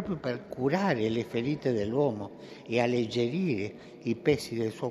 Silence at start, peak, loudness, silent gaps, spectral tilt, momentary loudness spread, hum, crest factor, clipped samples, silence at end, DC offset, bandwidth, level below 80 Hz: 0 s; -12 dBFS; -30 LUFS; none; -6.5 dB/octave; 9 LU; none; 18 dB; under 0.1%; 0 s; under 0.1%; 13.5 kHz; -64 dBFS